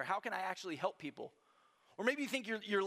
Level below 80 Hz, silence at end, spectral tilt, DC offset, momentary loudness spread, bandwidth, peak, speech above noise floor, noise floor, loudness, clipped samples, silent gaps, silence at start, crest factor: under -90 dBFS; 0 s; -4 dB/octave; under 0.1%; 15 LU; 15.5 kHz; -20 dBFS; 31 dB; -71 dBFS; -40 LUFS; under 0.1%; none; 0 s; 20 dB